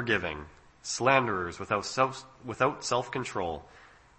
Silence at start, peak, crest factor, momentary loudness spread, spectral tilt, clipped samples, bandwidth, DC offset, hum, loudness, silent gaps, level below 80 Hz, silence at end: 0 s; -8 dBFS; 22 dB; 17 LU; -4 dB/octave; under 0.1%; 8.8 kHz; under 0.1%; none; -29 LUFS; none; -58 dBFS; 0.3 s